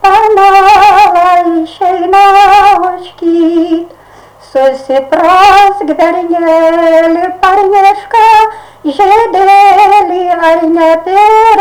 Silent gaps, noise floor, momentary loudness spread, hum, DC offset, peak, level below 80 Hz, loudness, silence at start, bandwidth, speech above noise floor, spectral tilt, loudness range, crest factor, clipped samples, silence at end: none; -36 dBFS; 9 LU; none; under 0.1%; 0 dBFS; -38 dBFS; -6 LUFS; 0 s; 18.5 kHz; 30 dB; -3.5 dB/octave; 3 LU; 6 dB; 2%; 0 s